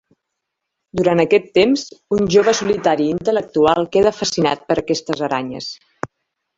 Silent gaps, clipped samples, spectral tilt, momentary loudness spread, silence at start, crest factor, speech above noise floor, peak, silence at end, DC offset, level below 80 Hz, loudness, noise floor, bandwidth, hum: none; under 0.1%; -5 dB/octave; 14 LU; 0.95 s; 16 dB; 62 dB; -2 dBFS; 0.5 s; under 0.1%; -50 dBFS; -17 LUFS; -78 dBFS; 7.8 kHz; none